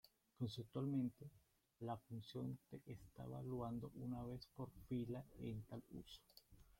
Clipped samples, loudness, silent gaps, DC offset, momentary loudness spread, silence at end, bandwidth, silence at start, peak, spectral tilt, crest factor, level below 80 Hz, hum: under 0.1%; -51 LUFS; none; under 0.1%; 14 LU; 0.05 s; 16.5 kHz; 0.05 s; -34 dBFS; -8 dB/octave; 16 dB; -70 dBFS; none